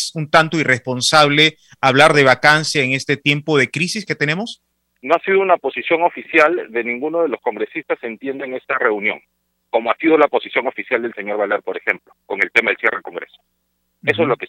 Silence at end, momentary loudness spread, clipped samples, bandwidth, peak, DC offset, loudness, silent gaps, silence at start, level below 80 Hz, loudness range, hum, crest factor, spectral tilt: 0 s; 13 LU; under 0.1%; 15.5 kHz; 0 dBFS; under 0.1%; -16 LUFS; none; 0 s; -60 dBFS; 7 LU; none; 18 dB; -4 dB/octave